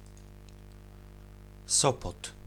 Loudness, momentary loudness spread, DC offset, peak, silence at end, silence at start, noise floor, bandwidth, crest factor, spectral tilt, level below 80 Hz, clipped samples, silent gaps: -28 LUFS; 27 LU; under 0.1%; -10 dBFS; 0.15 s; 0 s; -49 dBFS; 19.5 kHz; 26 dB; -2.5 dB/octave; -50 dBFS; under 0.1%; none